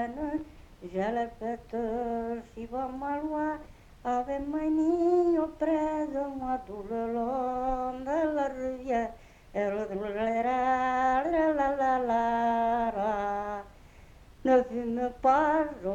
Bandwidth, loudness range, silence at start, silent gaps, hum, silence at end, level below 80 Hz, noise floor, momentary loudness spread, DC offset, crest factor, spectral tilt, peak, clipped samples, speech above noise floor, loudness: 9 kHz; 6 LU; 0 s; none; none; 0 s; -52 dBFS; -52 dBFS; 11 LU; under 0.1%; 16 dB; -6.5 dB/octave; -12 dBFS; under 0.1%; 24 dB; -30 LUFS